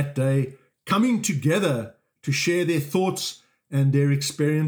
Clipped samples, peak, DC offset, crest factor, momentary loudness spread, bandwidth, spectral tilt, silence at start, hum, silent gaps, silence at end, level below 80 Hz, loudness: under 0.1%; -8 dBFS; under 0.1%; 14 dB; 10 LU; over 20 kHz; -5.5 dB/octave; 0 s; none; none; 0 s; -72 dBFS; -23 LUFS